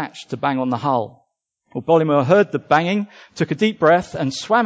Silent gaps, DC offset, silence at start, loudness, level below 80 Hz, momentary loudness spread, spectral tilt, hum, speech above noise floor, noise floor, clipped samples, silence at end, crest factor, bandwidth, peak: none; under 0.1%; 0 s; -19 LUFS; -58 dBFS; 14 LU; -6 dB/octave; none; 51 dB; -69 dBFS; under 0.1%; 0 s; 16 dB; 8 kHz; -2 dBFS